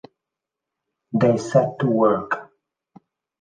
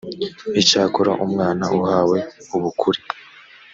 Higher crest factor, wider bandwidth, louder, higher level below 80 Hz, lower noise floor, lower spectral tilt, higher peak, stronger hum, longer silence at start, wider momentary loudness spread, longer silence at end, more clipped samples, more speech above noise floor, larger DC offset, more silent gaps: about the same, 20 dB vs 20 dB; first, 9.6 kHz vs 7.8 kHz; about the same, -20 LUFS vs -19 LUFS; about the same, -62 dBFS vs -60 dBFS; first, -85 dBFS vs -45 dBFS; first, -7.5 dB/octave vs -4.5 dB/octave; second, -4 dBFS vs 0 dBFS; neither; first, 1.15 s vs 0.05 s; about the same, 10 LU vs 12 LU; first, 0.95 s vs 0.35 s; neither; first, 67 dB vs 26 dB; neither; neither